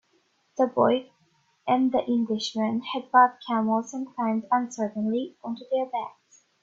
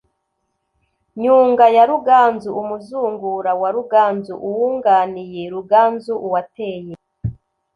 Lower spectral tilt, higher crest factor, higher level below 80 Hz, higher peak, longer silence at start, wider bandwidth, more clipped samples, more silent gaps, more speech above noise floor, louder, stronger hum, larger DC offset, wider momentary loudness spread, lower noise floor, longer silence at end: second, -5 dB/octave vs -7.5 dB/octave; about the same, 20 dB vs 16 dB; second, -72 dBFS vs -50 dBFS; second, -6 dBFS vs -2 dBFS; second, 0.55 s vs 1.15 s; about the same, 7.6 kHz vs 7.2 kHz; neither; neither; second, 43 dB vs 56 dB; second, -26 LUFS vs -16 LUFS; neither; neither; second, 12 LU vs 17 LU; second, -68 dBFS vs -72 dBFS; about the same, 0.5 s vs 0.45 s